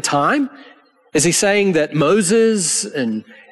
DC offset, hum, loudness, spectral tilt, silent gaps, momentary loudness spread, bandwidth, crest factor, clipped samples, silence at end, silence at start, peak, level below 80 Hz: under 0.1%; none; -16 LUFS; -3.5 dB/octave; none; 9 LU; 12.5 kHz; 12 dB; under 0.1%; 0.3 s; 0.05 s; -4 dBFS; -56 dBFS